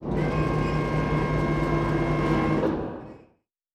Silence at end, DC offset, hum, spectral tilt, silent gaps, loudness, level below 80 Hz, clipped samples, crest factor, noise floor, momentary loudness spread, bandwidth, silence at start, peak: 0.55 s; under 0.1%; none; -8 dB/octave; none; -25 LUFS; -36 dBFS; under 0.1%; 14 dB; -64 dBFS; 8 LU; 9.4 kHz; 0 s; -12 dBFS